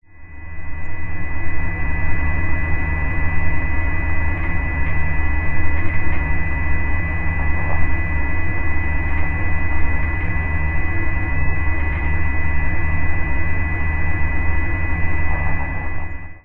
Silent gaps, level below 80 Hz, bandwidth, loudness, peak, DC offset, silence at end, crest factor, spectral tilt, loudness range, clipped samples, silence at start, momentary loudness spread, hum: none; -24 dBFS; 3.2 kHz; -23 LUFS; -4 dBFS; under 0.1%; 0.05 s; 12 dB; -9.5 dB/octave; 1 LU; under 0.1%; 0.15 s; 5 LU; none